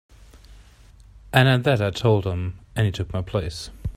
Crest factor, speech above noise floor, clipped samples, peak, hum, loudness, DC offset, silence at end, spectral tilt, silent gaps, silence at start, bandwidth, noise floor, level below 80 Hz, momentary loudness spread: 22 dB; 28 dB; under 0.1%; 0 dBFS; none; -22 LUFS; under 0.1%; 0 s; -6.5 dB/octave; none; 0.35 s; 15.5 kHz; -49 dBFS; -42 dBFS; 12 LU